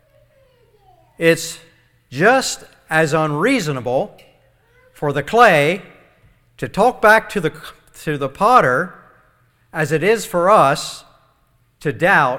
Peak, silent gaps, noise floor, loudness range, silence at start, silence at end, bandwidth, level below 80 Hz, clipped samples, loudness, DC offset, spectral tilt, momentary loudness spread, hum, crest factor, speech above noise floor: 0 dBFS; none; -59 dBFS; 3 LU; 1.2 s; 0 s; 18.5 kHz; -50 dBFS; under 0.1%; -16 LUFS; under 0.1%; -4.5 dB/octave; 17 LU; none; 18 dB; 43 dB